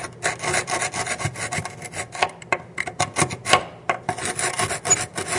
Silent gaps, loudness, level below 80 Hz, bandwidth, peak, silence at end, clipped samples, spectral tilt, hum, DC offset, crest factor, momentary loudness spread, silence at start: none; -23 LUFS; -56 dBFS; 12 kHz; 0 dBFS; 0 s; under 0.1%; -2 dB/octave; none; under 0.1%; 24 dB; 8 LU; 0 s